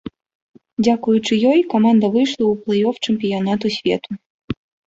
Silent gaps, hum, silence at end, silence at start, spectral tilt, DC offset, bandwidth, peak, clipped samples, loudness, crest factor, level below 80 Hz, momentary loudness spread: 0.35-0.49 s, 0.73-0.77 s, 4.26-4.48 s; none; 0.35 s; 0.05 s; -6 dB/octave; under 0.1%; 7.8 kHz; -4 dBFS; under 0.1%; -17 LUFS; 14 dB; -52 dBFS; 16 LU